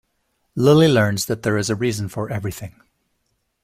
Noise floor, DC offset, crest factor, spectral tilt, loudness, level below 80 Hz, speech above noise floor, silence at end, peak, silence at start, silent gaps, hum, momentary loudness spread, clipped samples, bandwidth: -71 dBFS; under 0.1%; 18 dB; -5.5 dB/octave; -19 LUFS; -52 dBFS; 52 dB; 0.95 s; -2 dBFS; 0.55 s; none; none; 18 LU; under 0.1%; 16 kHz